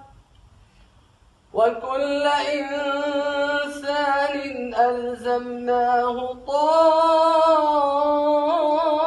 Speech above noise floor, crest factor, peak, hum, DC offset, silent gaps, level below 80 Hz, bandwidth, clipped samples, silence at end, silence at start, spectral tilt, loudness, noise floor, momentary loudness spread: 36 dB; 14 dB; -6 dBFS; none; under 0.1%; none; -58 dBFS; 11.5 kHz; under 0.1%; 0 s; 0 s; -3.5 dB/octave; -21 LUFS; -56 dBFS; 9 LU